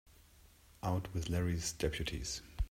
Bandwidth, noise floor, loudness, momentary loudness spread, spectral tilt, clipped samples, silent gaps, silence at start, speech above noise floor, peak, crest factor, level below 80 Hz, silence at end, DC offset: 16 kHz; -63 dBFS; -38 LUFS; 6 LU; -4.5 dB/octave; under 0.1%; none; 0.85 s; 25 dB; -22 dBFS; 18 dB; -46 dBFS; 0.05 s; under 0.1%